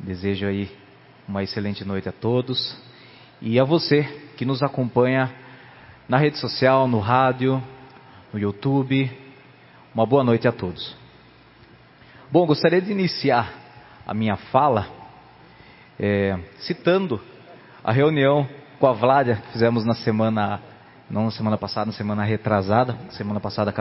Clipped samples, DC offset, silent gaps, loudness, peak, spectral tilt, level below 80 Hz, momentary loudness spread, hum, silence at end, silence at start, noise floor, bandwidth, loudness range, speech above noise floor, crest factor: under 0.1%; under 0.1%; none; -22 LUFS; -2 dBFS; -10.5 dB/octave; -52 dBFS; 13 LU; none; 0 s; 0 s; -50 dBFS; 5.8 kHz; 4 LU; 29 dB; 22 dB